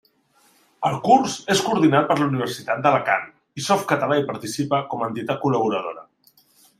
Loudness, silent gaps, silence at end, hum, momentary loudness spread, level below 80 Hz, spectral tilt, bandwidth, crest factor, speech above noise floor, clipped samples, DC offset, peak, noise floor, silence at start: -21 LUFS; none; 0.8 s; none; 10 LU; -64 dBFS; -5 dB/octave; 15.5 kHz; 20 dB; 39 dB; under 0.1%; under 0.1%; -2 dBFS; -60 dBFS; 0.8 s